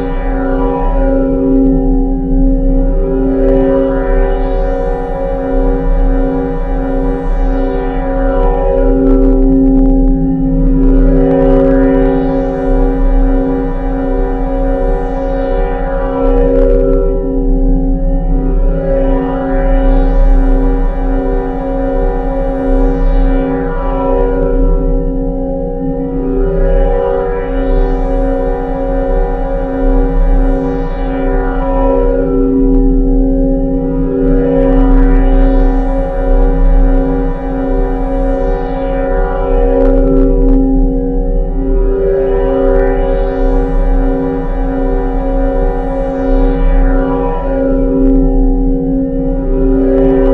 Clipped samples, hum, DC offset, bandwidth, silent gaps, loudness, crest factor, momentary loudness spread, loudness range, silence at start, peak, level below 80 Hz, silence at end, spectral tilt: 0.1%; none; 2%; 3.7 kHz; none; -13 LUFS; 10 dB; 6 LU; 4 LU; 0 s; 0 dBFS; -12 dBFS; 0 s; -10.5 dB/octave